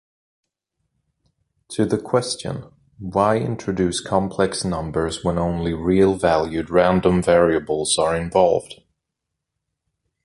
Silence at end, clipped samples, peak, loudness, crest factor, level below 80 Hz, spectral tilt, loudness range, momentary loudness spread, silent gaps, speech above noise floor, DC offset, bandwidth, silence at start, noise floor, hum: 1.5 s; under 0.1%; -2 dBFS; -20 LUFS; 18 dB; -42 dBFS; -5 dB/octave; 6 LU; 9 LU; none; 61 dB; under 0.1%; 11.5 kHz; 1.7 s; -81 dBFS; none